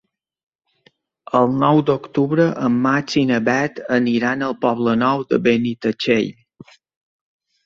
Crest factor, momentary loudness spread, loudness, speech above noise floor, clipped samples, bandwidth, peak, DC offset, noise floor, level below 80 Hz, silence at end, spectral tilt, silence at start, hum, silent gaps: 18 dB; 5 LU; -18 LUFS; 41 dB; under 0.1%; 7.4 kHz; -2 dBFS; under 0.1%; -59 dBFS; -58 dBFS; 1.35 s; -6.5 dB/octave; 1.35 s; none; none